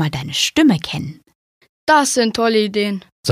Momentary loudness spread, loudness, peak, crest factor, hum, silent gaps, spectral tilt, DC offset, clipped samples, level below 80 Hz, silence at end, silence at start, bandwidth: 11 LU; -17 LUFS; -2 dBFS; 16 dB; none; 1.35-1.61 s, 1.69-1.87 s, 3.12-3.23 s; -4 dB/octave; under 0.1%; under 0.1%; -52 dBFS; 0 s; 0 s; 15.5 kHz